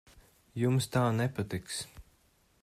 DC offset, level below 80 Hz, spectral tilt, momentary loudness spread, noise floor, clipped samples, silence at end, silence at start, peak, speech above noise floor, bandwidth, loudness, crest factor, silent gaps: under 0.1%; -60 dBFS; -5.5 dB/octave; 13 LU; -68 dBFS; under 0.1%; 0.6 s; 0.55 s; -16 dBFS; 37 dB; 14.5 kHz; -32 LUFS; 18 dB; none